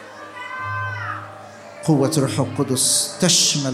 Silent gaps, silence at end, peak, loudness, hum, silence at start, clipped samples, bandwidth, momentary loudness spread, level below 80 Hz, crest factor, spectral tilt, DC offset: none; 0 s; -4 dBFS; -19 LUFS; none; 0 s; under 0.1%; 16 kHz; 21 LU; -64 dBFS; 18 dB; -3 dB/octave; under 0.1%